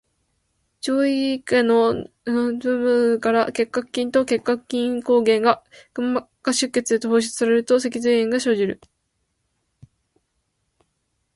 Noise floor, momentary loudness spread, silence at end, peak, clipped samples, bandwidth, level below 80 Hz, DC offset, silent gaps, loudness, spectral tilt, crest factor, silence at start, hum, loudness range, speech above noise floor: -73 dBFS; 7 LU; 2.6 s; -2 dBFS; under 0.1%; 11.5 kHz; -62 dBFS; under 0.1%; none; -21 LUFS; -4 dB/octave; 20 dB; 0.85 s; none; 3 LU; 53 dB